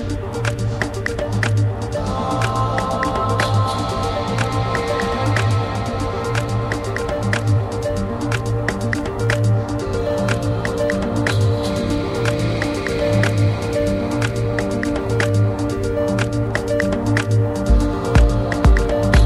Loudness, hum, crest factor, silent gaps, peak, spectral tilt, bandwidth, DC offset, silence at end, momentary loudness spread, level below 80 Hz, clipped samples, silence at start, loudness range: -20 LUFS; none; 16 dB; none; -2 dBFS; -6.5 dB/octave; 13 kHz; under 0.1%; 0 s; 5 LU; -26 dBFS; under 0.1%; 0 s; 2 LU